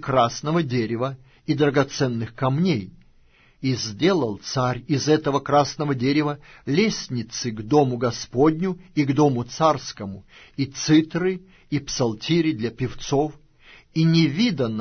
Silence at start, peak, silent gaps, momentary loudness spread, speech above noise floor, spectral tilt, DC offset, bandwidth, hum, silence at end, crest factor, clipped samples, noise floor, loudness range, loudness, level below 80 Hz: 0 s; -4 dBFS; none; 10 LU; 33 dB; -6 dB/octave; under 0.1%; 6.6 kHz; none; 0 s; 18 dB; under 0.1%; -55 dBFS; 2 LU; -22 LUFS; -52 dBFS